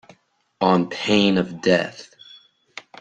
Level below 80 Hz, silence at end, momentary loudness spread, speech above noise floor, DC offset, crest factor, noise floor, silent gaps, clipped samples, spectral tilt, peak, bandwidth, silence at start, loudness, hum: -60 dBFS; 0.2 s; 23 LU; 37 dB; under 0.1%; 20 dB; -56 dBFS; none; under 0.1%; -5.5 dB/octave; -2 dBFS; 9 kHz; 0.6 s; -20 LUFS; none